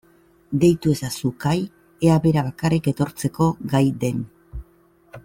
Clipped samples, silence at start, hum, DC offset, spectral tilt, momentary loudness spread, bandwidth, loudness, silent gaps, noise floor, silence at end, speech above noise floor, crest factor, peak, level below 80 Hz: under 0.1%; 0.5 s; none; under 0.1%; -7 dB/octave; 15 LU; 16.5 kHz; -21 LUFS; none; -56 dBFS; 0.05 s; 36 dB; 16 dB; -6 dBFS; -46 dBFS